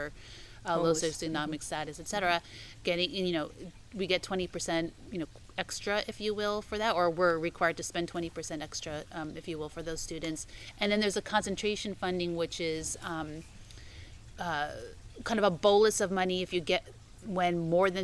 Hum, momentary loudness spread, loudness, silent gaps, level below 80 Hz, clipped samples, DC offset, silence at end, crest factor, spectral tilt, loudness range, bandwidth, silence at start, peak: none; 15 LU; -32 LUFS; none; -54 dBFS; under 0.1%; under 0.1%; 0 s; 20 dB; -4 dB/octave; 6 LU; 12 kHz; 0 s; -12 dBFS